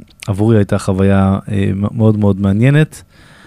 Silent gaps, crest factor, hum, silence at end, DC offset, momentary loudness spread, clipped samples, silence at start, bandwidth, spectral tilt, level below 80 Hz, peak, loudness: none; 12 dB; none; 0.45 s; under 0.1%; 6 LU; under 0.1%; 0.25 s; 12 kHz; -8 dB/octave; -44 dBFS; 0 dBFS; -13 LUFS